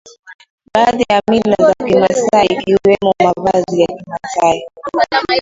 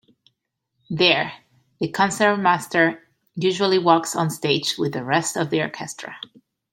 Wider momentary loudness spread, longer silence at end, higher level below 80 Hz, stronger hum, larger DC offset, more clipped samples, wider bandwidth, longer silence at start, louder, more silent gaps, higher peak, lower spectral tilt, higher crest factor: second, 6 LU vs 16 LU; second, 0 s vs 0.55 s; first, -46 dBFS vs -66 dBFS; neither; neither; neither; second, 7.8 kHz vs 16.5 kHz; second, 0.05 s vs 0.9 s; first, -13 LUFS vs -20 LUFS; first, 0.19-0.23 s, 0.34-0.39 s, 0.50-0.58 s vs none; about the same, 0 dBFS vs -2 dBFS; about the same, -5 dB/octave vs -4 dB/octave; second, 14 dB vs 22 dB